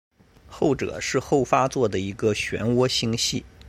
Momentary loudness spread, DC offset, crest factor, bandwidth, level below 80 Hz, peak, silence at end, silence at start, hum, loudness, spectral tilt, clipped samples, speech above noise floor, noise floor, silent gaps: 4 LU; under 0.1%; 20 dB; 16 kHz; -50 dBFS; -4 dBFS; 0 s; 0.5 s; none; -23 LUFS; -4.5 dB/octave; under 0.1%; 24 dB; -47 dBFS; none